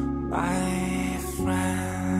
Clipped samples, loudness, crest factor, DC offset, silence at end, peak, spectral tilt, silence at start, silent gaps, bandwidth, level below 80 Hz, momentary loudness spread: under 0.1%; -27 LUFS; 14 dB; under 0.1%; 0 s; -12 dBFS; -5.5 dB/octave; 0 s; none; 16 kHz; -40 dBFS; 3 LU